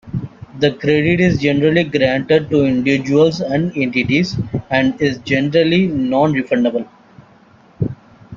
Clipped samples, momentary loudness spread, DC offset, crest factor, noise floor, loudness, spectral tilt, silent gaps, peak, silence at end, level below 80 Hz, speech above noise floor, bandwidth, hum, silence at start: under 0.1%; 10 LU; under 0.1%; 16 dB; -47 dBFS; -16 LUFS; -7 dB/octave; none; 0 dBFS; 0 s; -46 dBFS; 32 dB; 7.4 kHz; none; 0.05 s